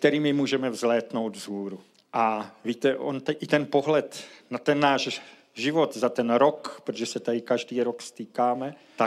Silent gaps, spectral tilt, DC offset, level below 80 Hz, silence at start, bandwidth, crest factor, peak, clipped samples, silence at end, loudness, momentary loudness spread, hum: none; -5 dB/octave; under 0.1%; -86 dBFS; 0 s; 14.5 kHz; 20 dB; -6 dBFS; under 0.1%; 0 s; -26 LUFS; 13 LU; none